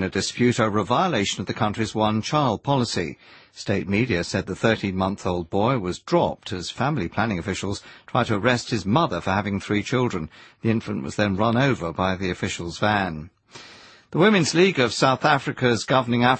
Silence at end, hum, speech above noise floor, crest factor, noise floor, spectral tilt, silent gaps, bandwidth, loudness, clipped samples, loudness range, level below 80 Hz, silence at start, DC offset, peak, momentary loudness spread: 0 s; none; 25 dB; 18 dB; -47 dBFS; -5.5 dB/octave; none; 8.8 kHz; -23 LUFS; under 0.1%; 3 LU; -52 dBFS; 0 s; under 0.1%; -4 dBFS; 10 LU